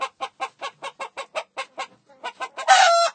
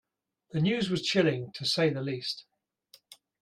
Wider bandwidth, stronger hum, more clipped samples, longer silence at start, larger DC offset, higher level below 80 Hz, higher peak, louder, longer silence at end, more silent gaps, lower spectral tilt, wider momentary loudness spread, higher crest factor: second, 9.4 kHz vs 15 kHz; neither; neither; second, 0 s vs 0.55 s; neither; second, -86 dBFS vs -68 dBFS; first, -2 dBFS vs -12 dBFS; first, -21 LUFS vs -29 LUFS; second, 0.05 s vs 0.3 s; neither; second, 2 dB/octave vs -5 dB/octave; first, 21 LU vs 10 LU; about the same, 22 dB vs 20 dB